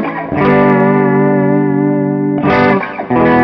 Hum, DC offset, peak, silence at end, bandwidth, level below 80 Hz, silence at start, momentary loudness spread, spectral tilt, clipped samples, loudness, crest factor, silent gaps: none; under 0.1%; 0 dBFS; 0 s; 6 kHz; -42 dBFS; 0 s; 5 LU; -10 dB/octave; under 0.1%; -11 LUFS; 10 dB; none